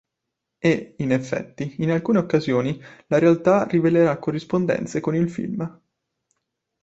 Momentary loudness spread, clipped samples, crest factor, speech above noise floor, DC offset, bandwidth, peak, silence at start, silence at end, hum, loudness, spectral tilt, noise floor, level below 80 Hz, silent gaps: 11 LU; under 0.1%; 18 dB; 61 dB; under 0.1%; 8 kHz; -4 dBFS; 0.65 s; 1.1 s; none; -22 LUFS; -7.5 dB/octave; -82 dBFS; -60 dBFS; none